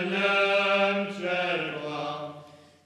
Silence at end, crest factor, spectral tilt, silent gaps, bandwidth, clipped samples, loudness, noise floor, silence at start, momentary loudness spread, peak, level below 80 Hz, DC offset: 0.3 s; 16 dB; -5 dB/octave; none; 11 kHz; under 0.1%; -26 LUFS; -50 dBFS; 0 s; 12 LU; -12 dBFS; -80 dBFS; under 0.1%